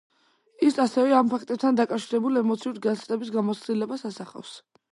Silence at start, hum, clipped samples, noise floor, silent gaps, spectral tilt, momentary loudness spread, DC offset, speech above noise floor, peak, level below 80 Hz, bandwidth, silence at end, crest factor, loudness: 0.6 s; none; under 0.1%; -59 dBFS; none; -6 dB/octave; 15 LU; under 0.1%; 34 dB; -8 dBFS; -78 dBFS; 11.5 kHz; 0.35 s; 18 dB; -25 LUFS